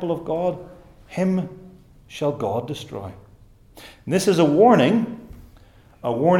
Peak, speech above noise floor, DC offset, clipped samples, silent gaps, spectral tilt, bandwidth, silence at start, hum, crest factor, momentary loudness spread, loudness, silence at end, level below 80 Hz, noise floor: -4 dBFS; 30 dB; under 0.1%; under 0.1%; none; -6.5 dB/octave; 17 kHz; 0 s; none; 18 dB; 21 LU; -21 LUFS; 0 s; -52 dBFS; -50 dBFS